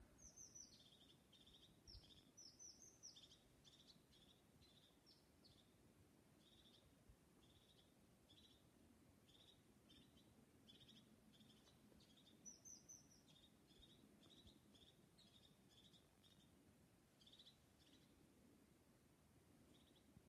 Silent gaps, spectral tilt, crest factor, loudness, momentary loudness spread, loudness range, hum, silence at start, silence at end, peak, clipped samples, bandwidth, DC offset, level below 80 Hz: none; -2.5 dB/octave; 20 dB; -65 LUFS; 8 LU; 4 LU; none; 0 s; 0 s; -50 dBFS; under 0.1%; 13 kHz; under 0.1%; -82 dBFS